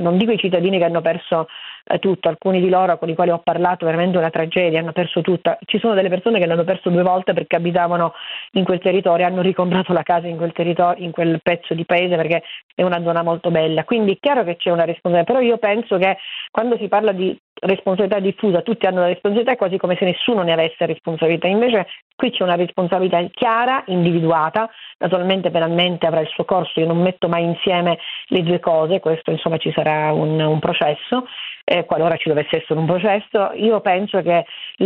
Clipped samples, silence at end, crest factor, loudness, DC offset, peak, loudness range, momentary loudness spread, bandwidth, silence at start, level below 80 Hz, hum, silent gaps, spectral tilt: under 0.1%; 0 s; 16 dB; -18 LUFS; under 0.1%; -2 dBFS; 1 LU; 5 LU; 4.3 kHz; 0 s; -62 dBFS; none; 12.63-12.77 s, 16.49-16.53 s, 17.39-17.56 s, 22.02-22.18 s, 31.63-31.67 s; -9.5 dB/octave